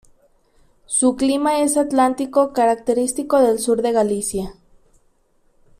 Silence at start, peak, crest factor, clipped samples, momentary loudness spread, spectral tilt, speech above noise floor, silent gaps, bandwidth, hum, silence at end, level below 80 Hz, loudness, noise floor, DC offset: 0.9 s; -4 dBFS; 16 dB; under 0.1%; 6 LU; -4 dB/octave; 42 dB; none; 15 kHz; none; 1.25 s; -50 dBFS; -18 LUFS; -60 dBFS; under 0.1%